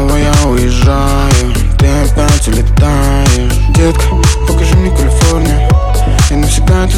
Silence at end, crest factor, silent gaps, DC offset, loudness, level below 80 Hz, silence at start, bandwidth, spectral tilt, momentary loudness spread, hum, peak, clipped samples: 0 s; 8 dB; none; under 0.1%; -10 LUFS; -10 dBFS; 0 s; 16 kHz; -5.5 dB/octave; 2 LU; none; 0 dBFS; under 0.1%